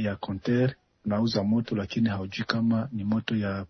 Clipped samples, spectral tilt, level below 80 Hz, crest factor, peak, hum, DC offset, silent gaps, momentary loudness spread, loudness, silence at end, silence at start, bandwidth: under 0.1%; -7.5 dB/octave; -58 dBFS; 20 dB; -6 dBFS; none; under 0.1%; none; 5 LU; -28 LUFS; 0 s; 0 s; 6.6 kHz